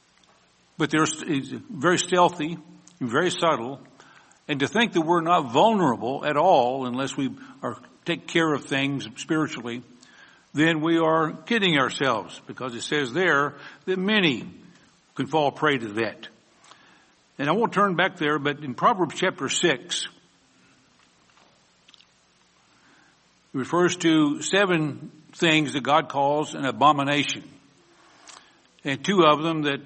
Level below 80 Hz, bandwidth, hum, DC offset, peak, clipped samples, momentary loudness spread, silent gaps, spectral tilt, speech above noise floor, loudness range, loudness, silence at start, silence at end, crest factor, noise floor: -68 dBFS; 8.8 kHz; none; under 0.1%; -4 dBFS; under 0.1%; 14 LU; none; -4.5 dB/octave; 38 dB; 5 LU; -23 LUFS; 0.8 s; 0 s; 20 dB; -61 dBFS